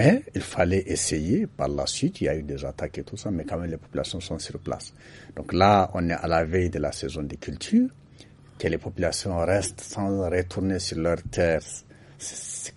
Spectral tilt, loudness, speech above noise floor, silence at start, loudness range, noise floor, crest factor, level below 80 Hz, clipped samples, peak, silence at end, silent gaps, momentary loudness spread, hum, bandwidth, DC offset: -5 dB/octave; -26 LUFS; 24 dB; 0 s; 5 LU; -50 dBFS; 22 dB; -44 dBFS; under 0.1%; -4 dBFS; 0.05 s; none; 11 LU; none; 11.5 kHz; under 0.1%